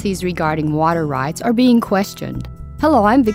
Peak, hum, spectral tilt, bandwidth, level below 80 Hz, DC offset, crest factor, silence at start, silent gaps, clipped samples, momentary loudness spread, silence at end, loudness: -2 dBFS; none; -6.5 dB/octave; 16 kHz; -38 dBFS; under 0.1%; 14 dB; 0 s; none; under 0.1%; 14 LU; 0 s; -16 LUFS